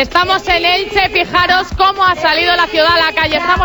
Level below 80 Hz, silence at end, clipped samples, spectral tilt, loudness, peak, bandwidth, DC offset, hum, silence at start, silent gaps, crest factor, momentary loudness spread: -32 dBFS; 0 s; under 0.1%; -3.5 dB/octave; -11 LUFS; 0 dBFS; over 20 kHz; 0.2%; none; 0 s; none; 12 dB; 2 LU